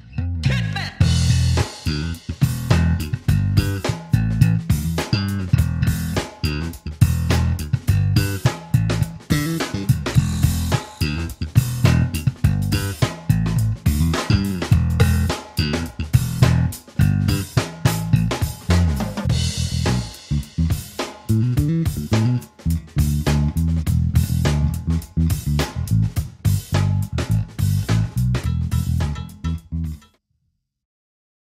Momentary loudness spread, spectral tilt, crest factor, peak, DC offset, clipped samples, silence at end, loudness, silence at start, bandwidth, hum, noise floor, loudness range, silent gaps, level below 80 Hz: 7 LU; -6 dB/octave; 20 dB; 0 dBFS; under 0.1%; under 0.1%; 1.55 s; -21 LUFS; 0.05 s; 16 kHz; none; -71 dBFS; 2 LU; none; -28 dBFS